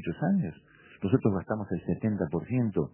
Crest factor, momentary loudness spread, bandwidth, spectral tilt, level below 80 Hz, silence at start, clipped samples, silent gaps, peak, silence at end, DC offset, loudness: 20 dB; 6 LU; 3.2 kHz; -9 dB/octave; -52 dBFS; 0 s; under 0.1%; none; -10 dBFS; 0.05 s; under 0.1%; -30 LUFS